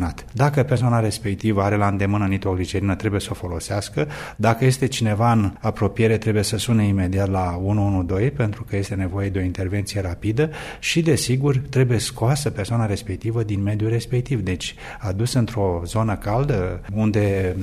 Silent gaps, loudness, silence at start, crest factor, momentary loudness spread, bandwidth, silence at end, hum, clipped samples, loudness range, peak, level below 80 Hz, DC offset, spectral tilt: none; -22 LUFS; 0 s; 18 dB; 7 LU; 14.5 kHz; 0 s; none; under 0.1%; 3 LU; -4 dBFS; -40 dBFS; under 0.1%; -6 dB/octave